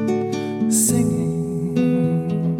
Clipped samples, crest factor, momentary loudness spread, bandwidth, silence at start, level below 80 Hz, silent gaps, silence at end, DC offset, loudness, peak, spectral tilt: under 0.1%; 14 dB; 7 LU; 18 kHz; 0 s; -52 dBFS; none; 0 s; under 0.1%; -20 LUFS; -6 dBFS; -6 dB/octave